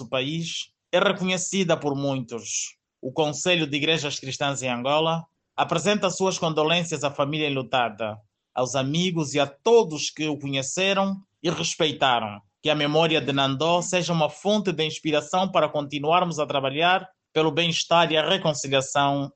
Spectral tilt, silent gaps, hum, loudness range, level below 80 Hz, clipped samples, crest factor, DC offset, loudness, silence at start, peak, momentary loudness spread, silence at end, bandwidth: -4 dB/octave; none; none; 3 LU; -66 dBFS; under 0.1%; 18 dB; under 0.1%; -24 LUFS; 0 s; -6 dBFS; 8 LU; 0.05 s; 9.2 kHz